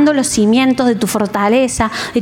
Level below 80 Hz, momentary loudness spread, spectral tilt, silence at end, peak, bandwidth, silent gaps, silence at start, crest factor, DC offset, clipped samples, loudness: -40 dBFS; 5 LU; -4 dB/octave; 0 s; -2 dBFS; 17 kHz; none; 0 s; 10 dB; under 0.1%; under 0.1%; -13 LUFS